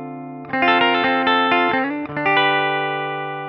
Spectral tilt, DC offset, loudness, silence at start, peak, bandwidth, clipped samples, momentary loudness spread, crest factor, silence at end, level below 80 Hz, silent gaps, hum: -6.5 dB/octave; under 0.1%; -18 LUFS; 0 s; -4 dBFS; 6 kHz; under 0.1%; 10 LU; 16 dB; 0 s; -62 dBFS; none; none